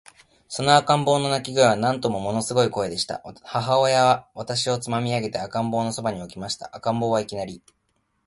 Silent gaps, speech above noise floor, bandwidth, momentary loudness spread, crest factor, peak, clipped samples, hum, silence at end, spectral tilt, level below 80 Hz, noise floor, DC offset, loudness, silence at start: none; 48 dB; 11.5 kHz; 12 LU; 22 dB; 0 dBFS; under 0.1%; none; 0.7 s; -4.5 dB/octave; -58 dBFS; -71 dBFS; under 0.1%; -23 LUFS; 0.5 s